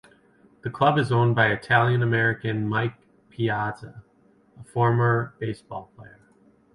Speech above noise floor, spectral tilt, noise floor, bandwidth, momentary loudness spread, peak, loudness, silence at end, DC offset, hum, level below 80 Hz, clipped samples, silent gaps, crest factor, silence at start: 36 dB; -7.5 dB/octave; -59 dBFS; 11 kHz; 16 LU; -6 dBFS; -23 LUFS; 0.7 s; under 0.1%; none; -58 dBFS; under 0.1%; none; 18 dB; 0.65 s